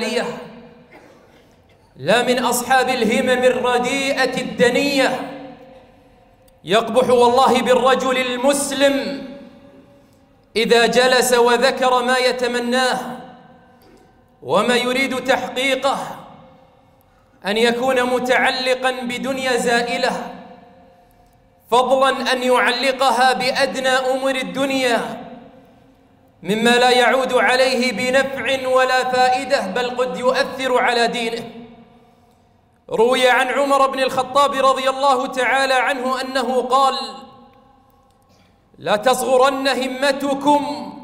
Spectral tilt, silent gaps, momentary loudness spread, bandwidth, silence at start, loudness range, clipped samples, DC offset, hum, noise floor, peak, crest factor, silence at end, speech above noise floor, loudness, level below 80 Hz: -3 dB/octave; none; 11 LU; 16 kHz; 0 s; 4 LU; under 0.1%; under 0.1%; none; -56 dBFS; -2 dBFS; 16 dB; 0 s; 39 dB; -17 LUFS; -56 dBFS